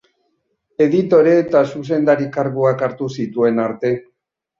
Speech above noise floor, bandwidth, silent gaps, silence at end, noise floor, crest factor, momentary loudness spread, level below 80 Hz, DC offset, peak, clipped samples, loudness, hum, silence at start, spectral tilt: 52 dB; 7.4 kHz; none; 0.6 s; -68 dBFS; 16 dB; 10 LU; -60 dBFS; under 0.1%; -2 dBFS; under 0.1%; -17 LUFS; none; 0.8 s; -8 dB/octave